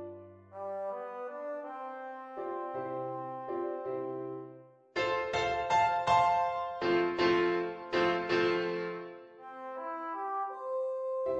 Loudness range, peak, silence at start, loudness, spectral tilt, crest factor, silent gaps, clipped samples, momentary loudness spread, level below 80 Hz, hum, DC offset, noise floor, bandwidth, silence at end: 10 LU; -14 dBFS; 0 s; -33 LUFS; -5 dB/octave; 18 dB; none; under 0.1%; 15 LU; -66 dBFS; none; under 0.1%; -54 dBFS; 8.2 kHz; 0 s